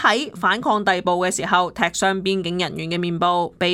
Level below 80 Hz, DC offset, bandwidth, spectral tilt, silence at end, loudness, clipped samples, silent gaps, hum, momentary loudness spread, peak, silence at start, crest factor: -54 dBFS; under 0.1%; 16.5 kHz; -3.5 dB/octave; 0 s; -20 LUFS; under 0.1%; none; none; 5 LU; -2 dBFS; 0 s; 18 dB